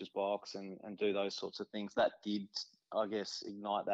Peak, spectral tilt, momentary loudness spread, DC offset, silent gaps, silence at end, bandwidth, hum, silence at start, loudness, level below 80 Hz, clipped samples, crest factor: -22 dBFS; -4.5 dB/octave; 9 LU; under 0.1%; none; 0 s; 8 kHz; none; 0 s; -39 LUFS; -80 dBFS; under 0.1%; 16 dB